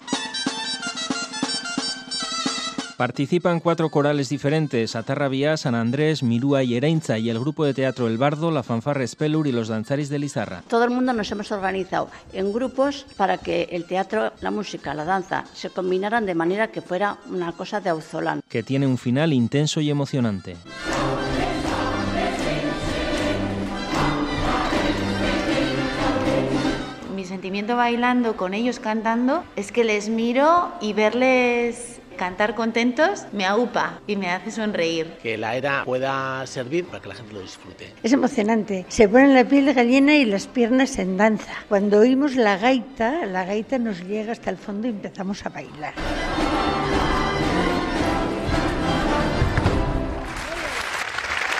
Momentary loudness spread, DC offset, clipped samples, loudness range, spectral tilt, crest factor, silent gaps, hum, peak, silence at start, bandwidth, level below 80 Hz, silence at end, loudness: 10 LU; under 0.1%; under 0.1%; 6 LU; -5.5 dB/octave; 22 dB; none; none; 0 dBFS; 0 s; 13 kHz; -40 dBFS; 0 s; -22 LUFS